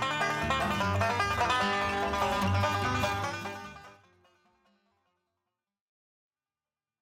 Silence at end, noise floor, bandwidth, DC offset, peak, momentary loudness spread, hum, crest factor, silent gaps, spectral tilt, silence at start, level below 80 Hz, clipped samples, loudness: 3.1 s; under -90 dBFS; 16 kHz; under 0.1%; -16 dBFS; 9 LU; none; 18 dB; none; -4.5 dB/octave; 0 s; -52 dBFS; under 0.1%; -29 LUFS